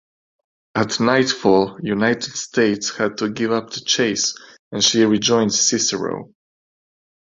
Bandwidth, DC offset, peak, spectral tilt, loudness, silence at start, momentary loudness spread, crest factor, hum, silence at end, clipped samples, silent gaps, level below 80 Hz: 7.8 kHz; under 0.1%; -2 dBFS; -3 dB/octave; -18 LUFS; 0.75 s; 8 LU; 18 dB; none; 1.15 s; under 0.1%; 4.59-4.71 s; -58 dBFS